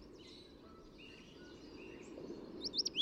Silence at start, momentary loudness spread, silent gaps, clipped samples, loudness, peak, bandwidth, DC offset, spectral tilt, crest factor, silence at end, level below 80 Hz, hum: 0 s; 19 LU; none; under 0.1%; -46 LUFS; -26 dBFS; 15.5 kHz; under 0.1%; -2.5 dB/octave; 20 dB; 0 s; -68 dBFS; none